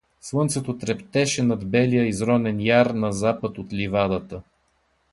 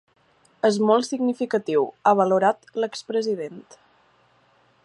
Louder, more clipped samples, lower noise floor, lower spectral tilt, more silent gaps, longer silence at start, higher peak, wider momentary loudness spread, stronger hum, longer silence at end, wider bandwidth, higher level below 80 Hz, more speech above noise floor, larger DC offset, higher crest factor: about the same, -23 LUFS vs -22 LUFS; neither; first, -67 dBFS vs -61 dBFS; about the same, -5.5 dB/octave vs -5.5 dB/octave; neither; second, 0.25 s vs 0.65 s; about the same, -4 dBFS vs -6 dBFS; about the same, 10 LU vs 10 LU; neither; second, 0.7 s vs 1.25 s; about the same, 11.5 kHz vs 11 kHz; first, -50 dBFS vs -78 dBFS; first, 45 dB vs 39 dB; neither; about the same, 18 dB vs 18 dB